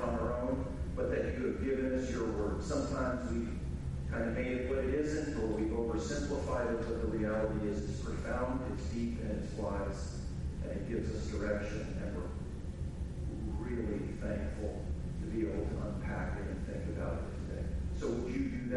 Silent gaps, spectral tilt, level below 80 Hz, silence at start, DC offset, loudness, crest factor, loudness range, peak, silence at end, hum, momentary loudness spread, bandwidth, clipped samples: none; -7 dB/octave; -42 dBFS; 0 s; under 0.1%; -37 LUFS; 14 dB; 4 LU; -20 dBFS; 0 s; none; 6 LU; 11.5 kHz; under 0.1%